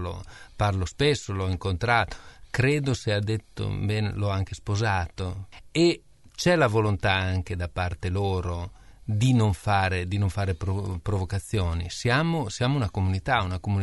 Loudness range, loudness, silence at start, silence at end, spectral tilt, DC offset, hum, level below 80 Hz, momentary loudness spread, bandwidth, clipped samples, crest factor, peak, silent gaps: 2 LU; -26 LUFS; 0 s; 0 s; -6 dB/octave; 0.2%; none; -42 dBFS; 10 LU; 11.5 kHz; under 0.1%; 20 dB; -6 dBFS; none